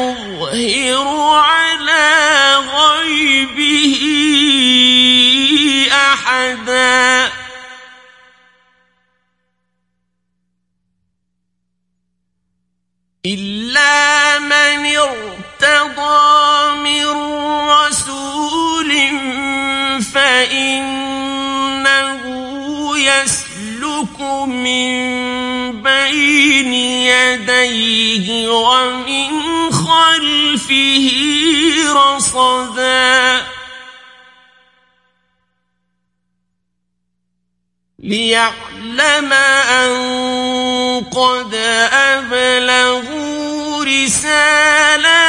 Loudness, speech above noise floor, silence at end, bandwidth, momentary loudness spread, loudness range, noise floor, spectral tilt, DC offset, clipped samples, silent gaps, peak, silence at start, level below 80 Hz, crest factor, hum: -11 LUFS; 59 dB; 0 s; 11.5 kHz; 11 LU; 7 LU; -71 dBFS; -1.5 dB/octave; under 0.1%; under 0.1%; none; 0 dBFS; 0 s; -50 dBFS; 14 dB; 60 Hz at -60 dBFS